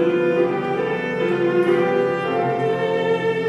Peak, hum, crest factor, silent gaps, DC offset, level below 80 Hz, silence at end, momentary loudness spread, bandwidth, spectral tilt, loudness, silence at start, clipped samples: -6 dBFS; none; 12 dB; none; under 0.1%; -60 dBFS; 0 s; 4 LU; 9.2 kHz; -7.5 dB/octave; -20 LUFS; 0 s; under 0.1%